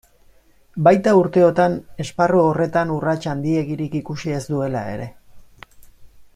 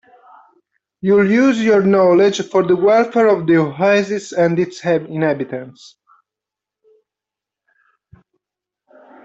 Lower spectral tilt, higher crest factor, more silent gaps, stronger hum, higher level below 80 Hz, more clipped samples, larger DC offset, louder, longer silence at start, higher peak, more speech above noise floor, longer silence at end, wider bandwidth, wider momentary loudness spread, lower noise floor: about the same, -7.5 dB/octave vs -6.5 dB/octave; about the same, 18 dB vs 14 dB; neither; neither; first, -52 dBFS vs -62 dBFS; neither; neither; second, -19 LUFS vs -15 LUFS; second, 0.75 s vs 1.05 s; about the same, -2 dBFS vs -4 dBFS; second, 34 dB vs 71 dB; second, 0.1 s vs 3.55 s; first, 13.5 kHz vs 8 kHz; first, 13 LU vs 8 LU; second, -52 dBFS vs -86 dBFS